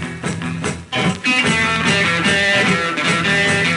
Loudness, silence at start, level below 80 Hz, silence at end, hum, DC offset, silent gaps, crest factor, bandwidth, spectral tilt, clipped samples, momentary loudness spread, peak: -16 LUFS; 0 s; -46 dBFS; 0 s; none; under 0.1%; none; 14 dB; 11.5 kHz; -3.5 dB/octave; under 0.1%; 10 LU; -4 dBFS